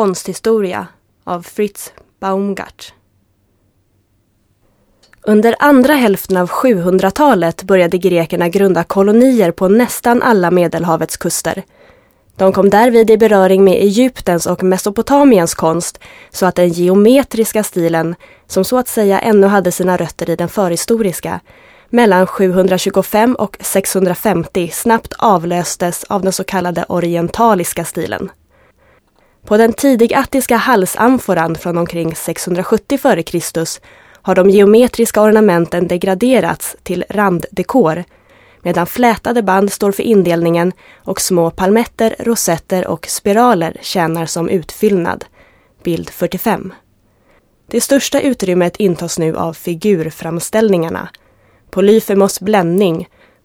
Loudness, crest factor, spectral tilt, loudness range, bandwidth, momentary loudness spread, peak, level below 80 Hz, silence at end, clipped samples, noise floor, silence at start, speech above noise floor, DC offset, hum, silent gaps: -13 LUFS; 12 dB; -5 dB/octave; 6 LU; over 20 kHz; 11 LU; 0 dBFS; -46 dBFS; 0.4 s; under 0.1%; -58 dBFS; 0 s; 46 dB; under 0.1%; none; none